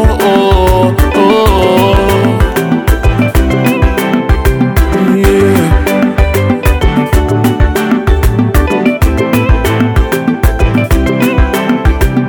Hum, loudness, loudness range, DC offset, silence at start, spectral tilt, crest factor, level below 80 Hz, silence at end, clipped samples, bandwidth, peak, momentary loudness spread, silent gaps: none; -10 LUFS; 2 LU; under 0.1%; 0 s; -6.5 dB/octave; 8 dB; -14 dBFS; 0 s; 0.3%; over 20 kHz; 0 dBFS; 3 LU; none